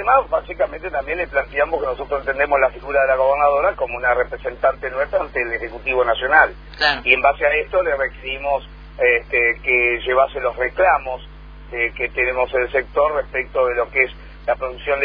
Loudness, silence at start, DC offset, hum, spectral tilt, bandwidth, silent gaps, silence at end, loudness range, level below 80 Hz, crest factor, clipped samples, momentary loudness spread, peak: -19 LUFS; 0 s; under 0.1%; none; -6 dB/octave; 5.2 kHz; none; 0 s; 3 LU; -38 dBFS; 20 dB; under 0.1%; 9 LU; 0 dBFS